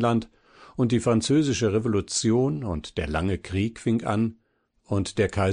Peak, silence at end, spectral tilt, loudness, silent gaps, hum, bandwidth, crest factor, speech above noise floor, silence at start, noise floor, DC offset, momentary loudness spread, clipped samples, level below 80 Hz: -10 dBFS; 0 s; -5.5 dB/octave; -25 LUFS; none; none; 10 kHz; 14 dB; 43 dB; 0 s; -66 dBFS; under 0.1%; 8 LU; under 0.1%; -46 dBFS